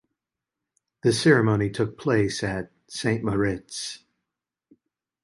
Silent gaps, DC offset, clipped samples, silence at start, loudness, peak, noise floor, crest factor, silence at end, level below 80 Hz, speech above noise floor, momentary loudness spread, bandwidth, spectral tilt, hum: none; under 0.1%; under 0.1%; 1.05 s; -24 LUFS; -6 dBFS; -87 dBFS; 20 dB; 1.25 s; -52 dBFS; 64 dB; 15 LU; 11.5 kHz; -5.5 dB/octave; none